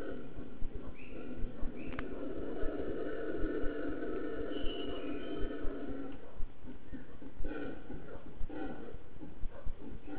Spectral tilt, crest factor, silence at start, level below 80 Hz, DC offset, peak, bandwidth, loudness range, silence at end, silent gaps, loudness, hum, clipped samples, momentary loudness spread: -5.5 dB/octave; 16 dB; 0 s; -46 dBFS; 2%; -18 dBFS; 4 kHz; 7 LU; 0 s; none; -43 LUFS; none; under 0.1%; 11 LU